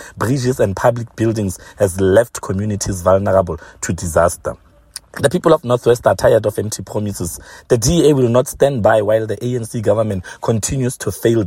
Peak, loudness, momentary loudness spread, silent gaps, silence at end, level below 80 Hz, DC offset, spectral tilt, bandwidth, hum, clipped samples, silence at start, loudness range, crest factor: 0 dBFS; -16 LUFS; 11 LU; none; 0 s; -40 dBFS; under 0.1%; -5.5 dB/octave; 16.5 kHz; none; under 0.1%; 0 s; 2 LU; 16 dB